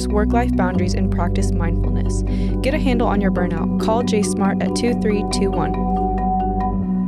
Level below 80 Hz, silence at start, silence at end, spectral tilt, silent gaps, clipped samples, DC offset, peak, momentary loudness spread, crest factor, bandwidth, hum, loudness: -24 dBFS; 0 s; 0 s; -6.5 dB/octave; none; under 0.1%; under 0.1%; -4 dBFS; 3 LU; 14 dB; 12 kHz; none; -19 LUFS